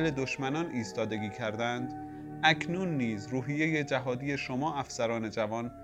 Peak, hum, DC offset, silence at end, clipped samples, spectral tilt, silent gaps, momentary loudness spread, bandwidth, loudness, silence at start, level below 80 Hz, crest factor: -10 dBFS; none; under 0.1%; 0 s; under 0.1%; -5.5 dB/octave; none; 7 LU; 11.5 kHz; -32 LUFS; 0 s; -60 dBFS; 22 dB